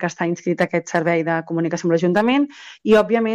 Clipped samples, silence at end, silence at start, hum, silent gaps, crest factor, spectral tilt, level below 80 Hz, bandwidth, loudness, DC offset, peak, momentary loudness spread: under 0.1%; 0 s; 0 s; none; none; 14 dB; -6 dB/octave; -58 dBFS; 10.5 kHz; -19 LUFS; under 0.1%; -6 dBFS; 7 LU